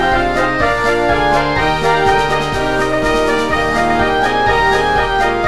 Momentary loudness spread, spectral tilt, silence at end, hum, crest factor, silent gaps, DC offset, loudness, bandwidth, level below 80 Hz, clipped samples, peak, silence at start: 2 LU; -4.5 dB/octave; 0 s; none; 12 dB; none; 3%; -14 LUFS; 14.5 kHz; -28 dBFS; under 0.1%; -2 dBFS; 0 s